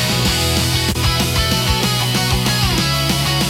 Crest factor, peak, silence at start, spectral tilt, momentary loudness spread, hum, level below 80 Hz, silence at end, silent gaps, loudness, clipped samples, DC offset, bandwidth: 14 dB; -2 dBFS; 0 s; -3.5 dB/octave; 1 LU; none; -28 dBFS; 0 s; none; -15 LUFS; under 0.1%; under 0.1%; 17 kHz